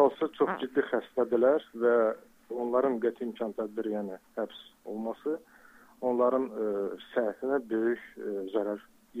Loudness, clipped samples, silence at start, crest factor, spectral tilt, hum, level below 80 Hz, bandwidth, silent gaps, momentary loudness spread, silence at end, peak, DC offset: -31 LUFS; under 0.1%; 0 s; 20 dB; -7 dB/octave; none; -74 dBFS; 15.5 kHz; none; 12 LU; 0 s; -12 dBFS; under 0.1%